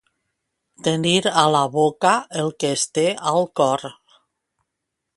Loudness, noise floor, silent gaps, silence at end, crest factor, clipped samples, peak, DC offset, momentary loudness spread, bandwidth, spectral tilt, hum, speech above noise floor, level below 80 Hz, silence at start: -20 LUFS; -80 dBFS; none; 1.25 s; 22 dB; under 0.1%; 0 dBFS; under 0.1%; 8 LU; 11.5 kHz; -4 dB/octave; none; 61 dB; -64 dBFS; 0.85 s